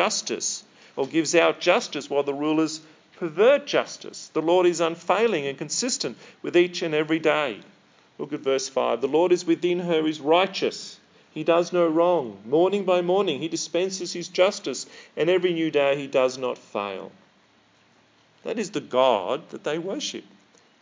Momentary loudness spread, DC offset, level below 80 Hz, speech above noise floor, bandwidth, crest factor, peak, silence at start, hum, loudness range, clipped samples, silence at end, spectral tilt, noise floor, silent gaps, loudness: 13 LU; under 0.1%; -82 dBFS; 36 dB; 7.6 kHz; 20 dB; -4 dBFS; 0 s; none; 5 LU; under 0.1%; 0.6 s; -3.5 dB/octave; -60 dBFS; none; -24 LUFS